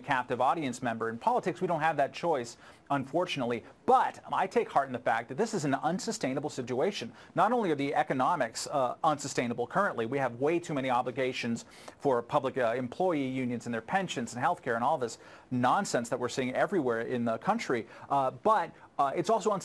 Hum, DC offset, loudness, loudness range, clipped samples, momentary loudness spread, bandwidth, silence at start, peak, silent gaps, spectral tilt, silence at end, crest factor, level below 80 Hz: none; under 0.1%; -31 LUFS; 1 LU; under 0.1%; 6 LU; 13 kHz; 0 s; -12 dBFS; none; -5 dB/octave; 0 s; 18 dB; -72 dBFS